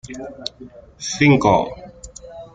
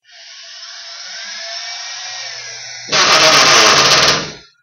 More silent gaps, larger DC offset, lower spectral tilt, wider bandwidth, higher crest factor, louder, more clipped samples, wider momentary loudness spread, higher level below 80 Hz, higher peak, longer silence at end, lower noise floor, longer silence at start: neither; neither; first, -5.5 dB/octave vs -0.5 dB/octave; second, 9.2 kHz vs over 20 kHz; about the same, 18 dB vs 14 dB; second, -17 LUFS vs -8 LUFS; neither; about the same, 24 LU vs 22 LU; first, -46 dBFS vs -52 dBFS; about the same, -2 dBFS vs 0 dBFS; second, 0.1 s vs 0.25 s; about the same, -38 dBFS vs -37 dBFS; second, 0.05 s vs 0.3 s